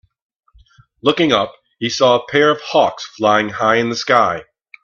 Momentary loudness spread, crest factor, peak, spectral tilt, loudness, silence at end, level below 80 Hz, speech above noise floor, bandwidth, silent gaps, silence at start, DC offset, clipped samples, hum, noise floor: 7 LU; 16 dB; 0 dBFS; -4 dB/octave; -16 LUFS; 0.4 s; -58 dBFS; 35 dB; 7.8 kHz; none; 1.05 s; under 0.1%; under 0.1%; none; -50 dBFS